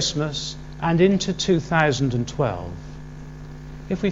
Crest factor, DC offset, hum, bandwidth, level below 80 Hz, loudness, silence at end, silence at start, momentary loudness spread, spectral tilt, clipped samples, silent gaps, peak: 20 dB; under 0.1%; none; 8 kHz; -42 dBFS; -22 LUFS; 0 s; 0 s; 20 LU; -5 dB/octave; under 0.1%; none; -2 dBFS